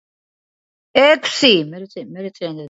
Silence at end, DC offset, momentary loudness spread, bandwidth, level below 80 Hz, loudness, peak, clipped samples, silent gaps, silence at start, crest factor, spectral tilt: 0 s; under 0.1%; 18 LU; 8 kHz; -66 dBFS; -14 LUFS; 0 dBFS; under 0.1%; none; 0.95 s; 18 dB; -3.5 dB/octave